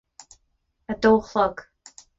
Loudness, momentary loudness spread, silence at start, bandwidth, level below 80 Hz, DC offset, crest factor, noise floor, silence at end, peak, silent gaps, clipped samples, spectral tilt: -21 LUFS; 16 LU; 0.9 s; 8 kHz; -52 dBFS; under 0.1%; 18 dB; -71 dBFS; 0.55 s; -6 dBFS; none; under 0.1%; -5.5 dB/octave